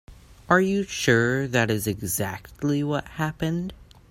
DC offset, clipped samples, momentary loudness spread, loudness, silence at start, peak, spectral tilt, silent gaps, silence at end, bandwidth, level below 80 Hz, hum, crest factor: under 0.1%; under 0.1%; 9 LU; -24 LUFS; 0.1 s; -4 dBFS; -5 dB/octave; none; 0.3 s; 16 kHz; -50 dBFS; none; 22 dB